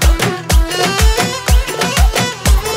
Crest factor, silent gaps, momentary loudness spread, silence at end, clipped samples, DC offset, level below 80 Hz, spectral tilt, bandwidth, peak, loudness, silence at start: 12 dB; none; 3 LU; 0 s; under 0.1%; under 0.1%; -14 dBFS; -4 dB/octave; 16.5 kHz; 0 dBFS; -14 LUFS; 0 s